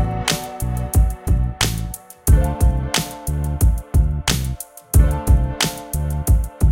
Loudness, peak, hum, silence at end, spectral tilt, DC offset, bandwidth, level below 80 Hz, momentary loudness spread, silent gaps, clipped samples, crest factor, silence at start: -20 LUFS; -2 dBFS; none; 0 s; -4.5 dB/octave; under 0.1%; 17 kHz; -20 dBFS; 8 LU; none; under 0.1%; 16 dB; 0 s